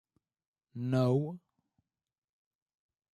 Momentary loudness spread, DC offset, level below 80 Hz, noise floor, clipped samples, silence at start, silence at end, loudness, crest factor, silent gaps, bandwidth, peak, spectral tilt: 21 LU; under 0.1%; -76 dBFS; -81 dBFS; under 0.1%; 0.75 s; 1.75 s; -32 LUFS; 20 dB; none; 10 kHz; -18 dBFS; -9 dB/octave